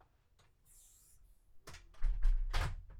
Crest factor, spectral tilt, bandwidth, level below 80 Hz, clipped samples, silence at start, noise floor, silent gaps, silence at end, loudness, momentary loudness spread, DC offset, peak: 16 dB; -4.5 dB/octave; 11.5 kHz; -38 dBFS; under 0.1%; 1.55 s; -70 dBFS; none; 0 s; -41 LUFS; 23 LU; under 0.1%; -20 dBFS